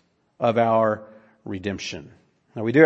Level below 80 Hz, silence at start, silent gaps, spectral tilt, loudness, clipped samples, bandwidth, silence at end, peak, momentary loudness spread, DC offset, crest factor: -62 dBFS; 0.4 s; none; -6.5 dB/octave; -24 LUFS; under 0.1%; 8 kHz; 0 s; 0 dBFS; 19 LU; under 0.1%; 22 dB